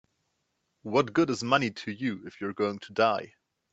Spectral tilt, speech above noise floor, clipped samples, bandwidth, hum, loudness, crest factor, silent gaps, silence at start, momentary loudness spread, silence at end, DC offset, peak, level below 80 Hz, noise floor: -5.5 dB/octave; 50 dB; under 0.1%; 8.2 kHz; none; -28 LUFS; 22 dB; none; 0.85 s; 11 LU; 0.45 s; under 0.1%; -8 dBFS; -70 dBFS; -78 dBFS